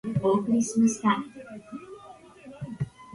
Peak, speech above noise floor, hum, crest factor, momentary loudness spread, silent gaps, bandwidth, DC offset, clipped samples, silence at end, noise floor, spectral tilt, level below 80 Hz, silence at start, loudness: -10 dBFS; 25 dB; none; 18 dB; 22 LU; none; 11.5 kHz; under 0.1%; under 0.1%; 0 s; -49 dBFS; -6 dB/octave; -60 dBFS; 0.05 s; -26 LUFS